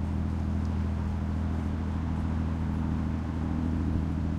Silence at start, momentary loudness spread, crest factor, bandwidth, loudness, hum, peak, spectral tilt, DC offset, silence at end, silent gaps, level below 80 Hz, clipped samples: 0 s; 2 LU; 14 dB; 7.2 kHz; -31 LUFS; none; -16 dBFS; -9 dB/octave; under 0.1%; 0 s; none; -38 dBFS; under 0.1%